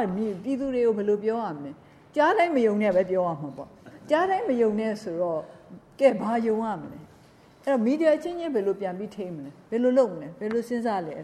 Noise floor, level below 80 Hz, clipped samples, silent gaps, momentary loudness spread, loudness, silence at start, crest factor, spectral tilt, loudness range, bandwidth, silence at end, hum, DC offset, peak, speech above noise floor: -54 dBFS; -64 dBFS; under 0.1%; none; 14 LU; -26 LUFS; 0 s; 18 dB; -7 dB/octave; 3 LU; 13 kHz; 0 s; none; under 0.1%; -8 dBFS; 29 dB